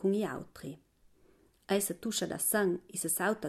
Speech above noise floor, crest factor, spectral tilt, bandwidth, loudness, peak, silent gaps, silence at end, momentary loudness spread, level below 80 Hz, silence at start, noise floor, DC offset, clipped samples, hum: 32 dB; 18 dB; -3.5 dB/octave; 15.5 kHz; -32 LUFS; -16 dBFS; none; 0 s; 17 LU; -68 dBFS; 0 s; -65 dBFS; under 0.1%; under 0.1%; none